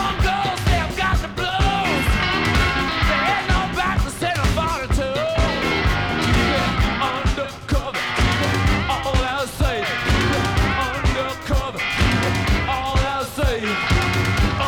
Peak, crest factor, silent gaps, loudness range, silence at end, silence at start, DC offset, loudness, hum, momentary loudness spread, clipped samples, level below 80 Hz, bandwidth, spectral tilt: -8 dBFS; 12 dB; none; 1 LU; 0 s; 0 s; under 0.1%; -20 LUFS; none; 4 LU; under 0.1%; -26 dBFS; 19 kHz; -5 dB/octave